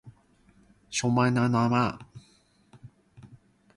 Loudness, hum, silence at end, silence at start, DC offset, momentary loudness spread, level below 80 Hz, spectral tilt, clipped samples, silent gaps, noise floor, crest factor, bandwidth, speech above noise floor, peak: -26 LUFS; none; 0.5 s; 0.05 s; under 0.1%; 9 LU; -60 dBFS; -5.5 dB/octave; under 0.1%; none; -63 dBFS; 18 dB; 11.5 kHz; 38 dB; -10 dBFS